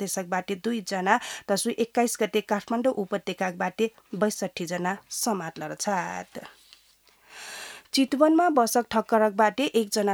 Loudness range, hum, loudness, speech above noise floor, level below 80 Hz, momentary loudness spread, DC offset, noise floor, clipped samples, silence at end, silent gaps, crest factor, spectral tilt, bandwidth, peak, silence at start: 7 LU; none; -26 LUFS; 35 dB; -70 dBFS; 13 LU; under 0.1%; -60 dBFS; under 0.1%; 0 s; none; 20 dB; -4 dB/octave; over 20 kHz; -6 dBFS; 0 s